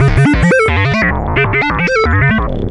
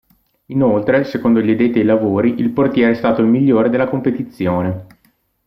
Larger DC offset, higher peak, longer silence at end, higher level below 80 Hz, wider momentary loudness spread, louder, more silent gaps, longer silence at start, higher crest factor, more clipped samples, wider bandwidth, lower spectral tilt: neither; about the same, 0 dBFS vs -2 dBFS; second, 0 s vs 0.6 s; first, -22 dBFS vs -52 dBFS; second, 3 LU vs 7 LU; first, -11 LUFS vs -15 LUFS; neither; second, 0 s vs 0.5 s; about the same, 10 dB vs 14 dB; neither; first, 11 kHz vs 5.8 kHz; second, -7 dB/octave vs -9.5 dB/octave